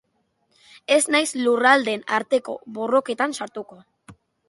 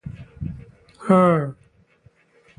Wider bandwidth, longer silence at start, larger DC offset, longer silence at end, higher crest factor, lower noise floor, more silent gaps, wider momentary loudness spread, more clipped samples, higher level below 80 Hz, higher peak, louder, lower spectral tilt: first, 11.5 kHz vs 10 kHz; first, 0.9 s vs 0.05 s; neither; second, 0.35 s vs 1.05 s; about the same, 20 dB vs 20 dB; first, -69 dBFS vs -57 dBFS; neither; second, 17 LU vs 22 LU; neither; second, -72 dBFS vs -48 dBFS; about the same, -2 dBFS vs -4 dBFS; second, -21 LUFS vs -18 LUFS; second, -2 dB/octave vs -9 dB/octave